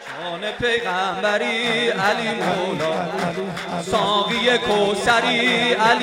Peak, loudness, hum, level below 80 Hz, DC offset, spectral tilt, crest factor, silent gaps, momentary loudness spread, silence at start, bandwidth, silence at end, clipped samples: -2 dBFS; -20 LUFS; none; -52 dBFS; under 0.1%; -3.5 dB/octave; 18 dB; none; 9 LU; 0 s; 16 kHz; 0 s; under 0.1%